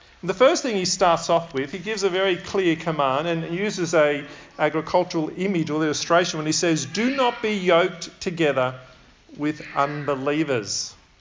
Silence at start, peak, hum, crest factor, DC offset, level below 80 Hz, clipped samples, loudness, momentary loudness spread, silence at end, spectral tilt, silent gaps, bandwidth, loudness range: 0.25 s; -4 dBFS; none; 18 dB; under 0.1%; -58 dBFS; under 0.1%; -22 LUFS; 9 LU; 0.25 s; -4 dB/octave; none; 7.6 kHz; 2 LU